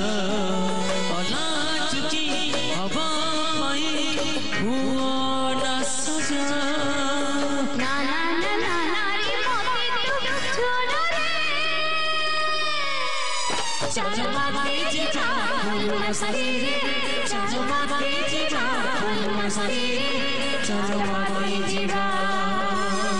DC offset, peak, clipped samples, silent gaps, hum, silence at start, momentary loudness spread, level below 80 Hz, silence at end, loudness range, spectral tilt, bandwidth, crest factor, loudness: 5%; -12 dBFS; under 0.1%; none; none; 0 s; 2 LU; -54 dBFS; 0 s; 1 LU; -3 dB/octave; 12 kHz; 12 dB; -24 LUFS